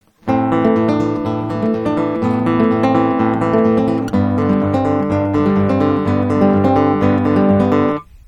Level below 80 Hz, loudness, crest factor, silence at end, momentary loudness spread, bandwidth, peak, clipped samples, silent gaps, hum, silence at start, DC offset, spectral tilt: -44 dBFS; -15 LUFS; 14 dB; 0.1 s; 5 LU; 9 kHz; 0 dBFS; under 0.1%; none; none; 0.25 s; under 0.1%; -9 dB/octave